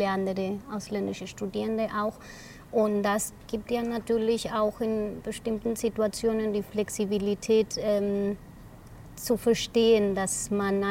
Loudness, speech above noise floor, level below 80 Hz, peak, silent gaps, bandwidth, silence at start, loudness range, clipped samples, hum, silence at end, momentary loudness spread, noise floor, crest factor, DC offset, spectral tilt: -28 LUFS; 19 dB; -52 dBFS; -12 dBFS; none; 16.5 kHz; 0 s; 3 LU; under 0.1%; none; 0 s; 10 LU; -47 dBFS; 16 dB; under 0.1%; -4.5 dB/octave